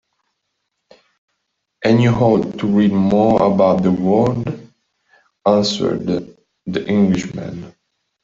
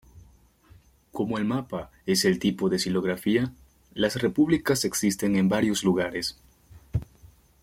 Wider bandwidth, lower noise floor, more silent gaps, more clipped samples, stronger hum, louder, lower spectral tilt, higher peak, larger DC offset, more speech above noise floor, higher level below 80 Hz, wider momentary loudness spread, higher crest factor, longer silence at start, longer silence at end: second, 7.6 kHz vs 16.5 kHz; first, -73 dBFS vs -56 dBFS; neither; neither; neither; first, -16 LUFS vs -26 LUFS; first, -7 dB/octave vs -5 dB/octave; first, -2 dBFS vs -10 dBFS; neither; first, 58 dB vs 31 dB; about the same, -50 dBFS vs -52 dBFS; first, 14 LU vs 11 LU; about the same, 16 dB vs 18 dB; first, 1.8 s vs 0.15 s; first, 0.55 s vs 0.35 s